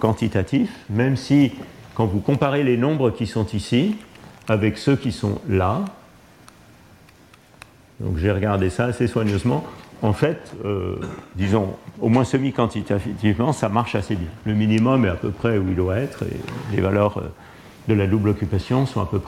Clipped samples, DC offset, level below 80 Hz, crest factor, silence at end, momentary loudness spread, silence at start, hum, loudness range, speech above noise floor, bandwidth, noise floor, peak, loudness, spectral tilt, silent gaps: under 0.1%; under 0.1%; -44 dBFS; 16 dB; 0 s; 10 LU; 0 s; none; 4 LU; 29 dB; 13.5 kHz; -50 dBFS; -4 dBFS; -22 LUFS; -7.5 dB/octave; none